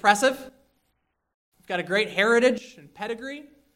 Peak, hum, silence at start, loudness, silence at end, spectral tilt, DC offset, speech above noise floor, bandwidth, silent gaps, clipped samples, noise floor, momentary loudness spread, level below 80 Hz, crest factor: -2 dBFS; none; 0.05 s; -24 LUFS; 0.35 s; -3 dB/octave; under 0.1%; 51 dB; 16 kHz; 1.34-1.52 s; under 0.1%; -74 dBFS; 18 LU; -68 dBFS; 22 dB